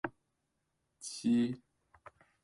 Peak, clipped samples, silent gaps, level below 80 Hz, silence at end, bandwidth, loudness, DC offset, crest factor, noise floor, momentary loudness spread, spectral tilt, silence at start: -20 dBFS; under 0.1%; none; -74 dBFS; 0.85 s; 11.5 kHz; -34 LUFS; under 0.1%; 18 dB; -83 dBFS; 17 LU; -5 dB/octave; 0.05 s